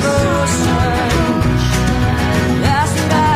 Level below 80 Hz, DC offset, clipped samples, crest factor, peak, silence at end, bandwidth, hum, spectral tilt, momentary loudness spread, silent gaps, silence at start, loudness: -24 dBFS; under 0.1%; under 0.1%; 12 dB; -2 dBFS; 0 s; 16 kHz; none; -5.5 dB/octave; 1 LU; none; 0 s; -15 LUFS